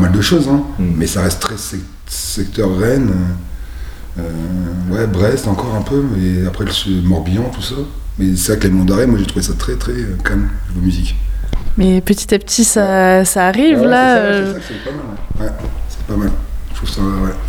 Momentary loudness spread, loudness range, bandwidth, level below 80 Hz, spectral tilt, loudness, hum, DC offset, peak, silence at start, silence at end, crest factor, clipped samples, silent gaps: 14 LU; 6 LU; over 20 kHz; -22 dBFS; -5 dB/octave; -15 LUFS; none; under 0.1%; 0 dBFS; 0 s; 0 s; 14 dB; under 0.1%; none